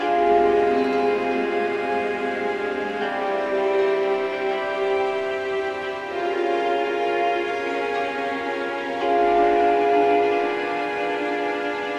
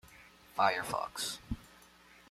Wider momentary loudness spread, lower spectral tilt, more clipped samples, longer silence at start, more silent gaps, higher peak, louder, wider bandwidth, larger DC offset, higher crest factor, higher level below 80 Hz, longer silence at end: second, 7 LU vs 20 LU; first, -5 dB/octave vs -2.5 dB/octave; neither; about the same, 0 s vs 0.1 s; neither; first, -8 dBFS vs -14 dBFS; first, -22 LUFS vs -35 LUFS; second, 9 kHz vs 16 kHz; neither; second, 14 dB vs 24 dB; about the same, -56 dBFS vs -56 dBFS; second, 0 s vs 0.65 s